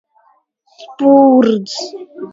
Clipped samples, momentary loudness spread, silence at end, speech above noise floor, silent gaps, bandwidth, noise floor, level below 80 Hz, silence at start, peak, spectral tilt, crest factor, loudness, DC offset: under 0.1%; 19 LU; 0.05 s; 44 dB; none; 7.8 kHz; -56 dBFS; -60 dBFS; 0.8 s; 0 dBFS; -5.5 dB/octave; 14 dB; -11 LUFS; under 0.1%